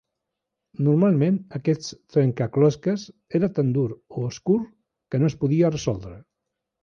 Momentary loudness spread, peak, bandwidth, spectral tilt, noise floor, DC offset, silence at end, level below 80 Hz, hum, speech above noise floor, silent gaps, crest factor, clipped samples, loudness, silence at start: 11 LU; -8 dBFS; 7.2 kHz; -8 dB/octave; -83 dBFS; under 0.1%; 0.65 s; -56 dBFS; none; 60 dB; none; 16 dB; under 0.1%; -23 LUFS; 0.8 s